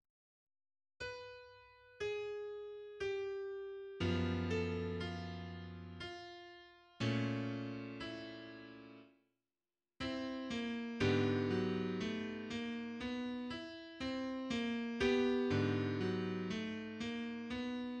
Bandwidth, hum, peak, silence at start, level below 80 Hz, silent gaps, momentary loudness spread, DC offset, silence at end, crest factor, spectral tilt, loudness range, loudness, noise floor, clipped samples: 9.2 kHz; none; -22 dBFS; 1 s; -66 dBFS; none; 15 LU; under 0.1%; 0 s; 18 dB; -6.5 dB/octave; 8 LU; -40 LUFS; under -90 dBFS; under 0.1%